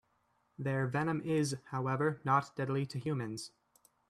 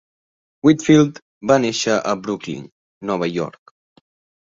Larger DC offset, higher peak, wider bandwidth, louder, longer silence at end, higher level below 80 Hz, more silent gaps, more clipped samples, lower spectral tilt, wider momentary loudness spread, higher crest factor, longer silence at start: neither; second, -16 dBFS vs -2 dBFS; first, 13.5 kHz vs 7.8 kHz; second, -35 LUFS vs -18 LUFS; second, 0.6 s vs 0.9 s; second, -74 dBFS vs -58 dBFS; second, none vs 1.22-1.41 s, 2.72-3.01 s; neither; about the same, -6.5 dB/octave vs -5.5 dB/octave; second, 9 LU vs 16 LU; about the same, 20 dB vs 18 dB; about the same, 0.6 s vs 0.65 s